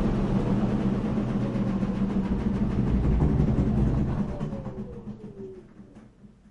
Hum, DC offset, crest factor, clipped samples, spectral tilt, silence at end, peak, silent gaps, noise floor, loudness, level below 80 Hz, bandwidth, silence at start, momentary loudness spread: none; under 0.1%; 16 dB; under 0.1%; -9.5 dB/octave; 0.25 s; -10 dBFS; none; -51 dBFS; -27 LUFS; -34 dBFS; 7.8 kHz; 0 s; 16 LU